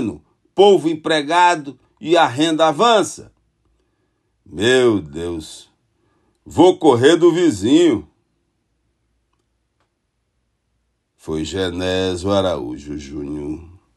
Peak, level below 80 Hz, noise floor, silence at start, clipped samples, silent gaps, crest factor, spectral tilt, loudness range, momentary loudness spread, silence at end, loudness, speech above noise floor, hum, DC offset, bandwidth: 0 dBFS; -48 dBFS; -70 dBFS; 0 s; under 0.1%; none; 18 dB; -5 dB/octave; 10 LU; 18 LU; 0.3 s; -16 LUFS; 55 dB; none; under 0.1%; 12 kHz